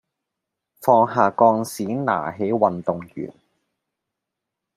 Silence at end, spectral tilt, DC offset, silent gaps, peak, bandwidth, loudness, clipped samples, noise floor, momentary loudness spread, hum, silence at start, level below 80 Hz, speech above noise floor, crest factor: 1.45 s; -6.5 dB/octave; under 0.1%; none; -2 dBFS; 15.5 kHz; -20 LUFS; under 0.1%; -83 dBFS; 15 LU; none; 0.8 s; -66 dBFS; 64 dB; 20 dB